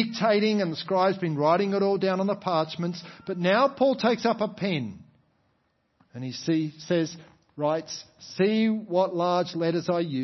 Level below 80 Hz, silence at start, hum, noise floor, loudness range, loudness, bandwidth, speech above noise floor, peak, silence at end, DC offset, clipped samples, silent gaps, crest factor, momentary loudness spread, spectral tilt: -72 dBFS; 0 s; none; -71 dBFS; 6 LU; -26 LUFS; 6.2 kHz; 46 dB; -8 dBFS; 0 s; under 0.1%; under 0.1%; none; 18 dB; 13 LU; -6 dB/octave